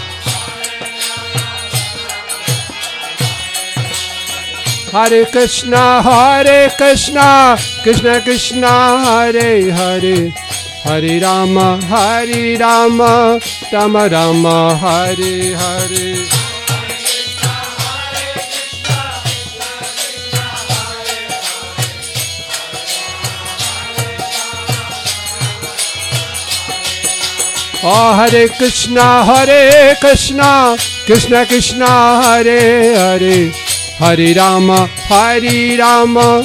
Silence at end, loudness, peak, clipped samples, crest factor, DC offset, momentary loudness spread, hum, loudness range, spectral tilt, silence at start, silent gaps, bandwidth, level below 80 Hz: 0 s; -11 LUFS; 0 dBFS; under 0.1%; 12 dB; under 0.1%; 11 LU; none; 10 LU; -3.5 dB/octave; 0 s; none; 17 kHz; -38 dBFS